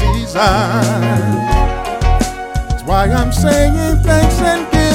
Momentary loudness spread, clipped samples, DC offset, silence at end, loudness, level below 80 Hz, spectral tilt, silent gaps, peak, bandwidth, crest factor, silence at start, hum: 6 LU; under 0.1%; under 0.1%; 0 s; -14 LUFS; -18 dBFS; -5.5 dB/octave; none; 0 dBFS; 16.5 kHz; 12 dB; 0 s; none